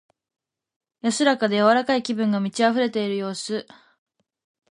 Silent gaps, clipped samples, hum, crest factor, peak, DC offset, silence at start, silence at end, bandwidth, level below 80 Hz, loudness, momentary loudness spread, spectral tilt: none; under 0.1%; none; 20 dB; -4 dBFS; under 0.1%; 1.05 s; 1.1 s; 11.5 kHz; -72 dBFS; -22 LUFS; 10 LU; -4.5 dB/octave